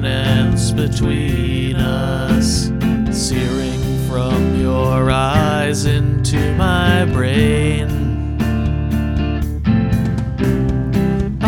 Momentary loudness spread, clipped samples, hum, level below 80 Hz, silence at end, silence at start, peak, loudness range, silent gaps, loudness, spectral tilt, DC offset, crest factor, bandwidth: 5 LU; under 0.1%; none; -24 dBFS; 0 s; 0 s; 0 dBFS; 3 LU; none; -17 LUFS; -6 dB/octave; 0.2%; 16 dB; 17 kHz